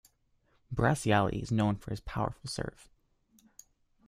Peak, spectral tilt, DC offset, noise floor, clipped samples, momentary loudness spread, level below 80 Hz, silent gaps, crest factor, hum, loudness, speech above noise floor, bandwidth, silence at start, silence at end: -10 dBFS; -6 dB/octave; under 0.1%; -71 dBFS; under 0.1%; 11 LU; -52 dBFS; none; 22 dB; none; -32 LUFS; 40 dB; 15 kHz; 0.7 s; 1.4 s